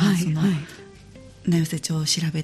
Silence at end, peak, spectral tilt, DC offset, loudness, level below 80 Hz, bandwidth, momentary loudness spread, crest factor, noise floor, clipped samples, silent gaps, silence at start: 0 s; -8 dBFS; -5 dB/octave; under 0.1%; -23 LUFS; -54 dBFS; 14 kHz; 13 LU; 14 dB; -45 dBFS; under 0.1%; none; 0 s